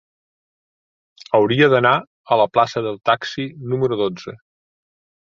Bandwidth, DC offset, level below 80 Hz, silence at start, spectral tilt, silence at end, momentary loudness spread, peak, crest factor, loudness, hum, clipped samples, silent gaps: 7.6 kHz; under 0.1%; -60 dBFS; 1.3 s; -6.5 dB/octave; 1.05 s; 12 LU; -2 dBFS; 18 dB; -18 LUFS; none; under 0.1%; 2.07-2.24 s